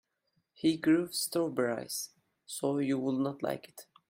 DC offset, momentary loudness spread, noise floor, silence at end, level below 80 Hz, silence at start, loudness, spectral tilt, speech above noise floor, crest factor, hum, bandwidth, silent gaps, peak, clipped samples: under 0.1%; 13 LU; -79 dBFS; 0.3 s; -76 dBFS; 0.65 s; -32 LUFS; -4.5 dB/octave; 47 dB; 16 dB; none; 16 kHz; none; -16 dBFS; under 0.1%